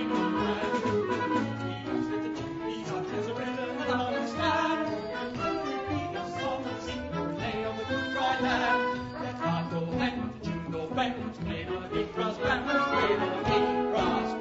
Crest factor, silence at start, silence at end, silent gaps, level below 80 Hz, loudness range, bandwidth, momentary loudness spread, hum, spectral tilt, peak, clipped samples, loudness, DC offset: 16 dB; 0 s; 0 s; none; -52 dBFS; 3 LU; 8 kHz; 8 LU; none; -6 dB/octave; -14 dBFS; under 0.1%; -30 LUFS; under 0.1%